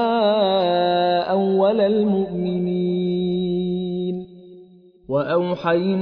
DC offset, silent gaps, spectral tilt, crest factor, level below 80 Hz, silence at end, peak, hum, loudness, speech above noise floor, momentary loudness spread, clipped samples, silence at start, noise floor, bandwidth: under 0.1%; none; -9.5 dB/octave; 14 dB; -56 dBFS; 0 s; -6 dBFS; none; -20 LUFS; 28 dB; 7 LU; under 0.1%; 0 s; -48 dBFS; 5.4 kHz